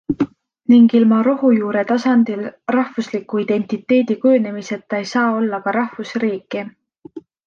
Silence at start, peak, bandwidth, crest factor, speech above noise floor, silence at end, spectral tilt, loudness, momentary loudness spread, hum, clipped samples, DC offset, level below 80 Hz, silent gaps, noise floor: 0.1 s; -2 dBFS; 7 kHz; 14 dB; 22 dB; 0.25 s; -6.5 dB/octave; -17 LUFS; 12 LU; none; under 0.1%; under 0.1%; -60 dBFS; none; -38 dBFS